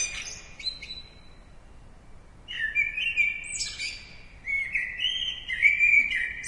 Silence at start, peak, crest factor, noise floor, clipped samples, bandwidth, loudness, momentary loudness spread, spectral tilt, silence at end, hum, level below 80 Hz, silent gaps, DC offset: 0 s; -8 dBFS; 20 dB; -48 dBFS; under 0.1%; 11.5 kHz; -25 LUFS; 19 LU; 1 dB/octave; 0 s; none; -50 dBFS; none; under 0.1%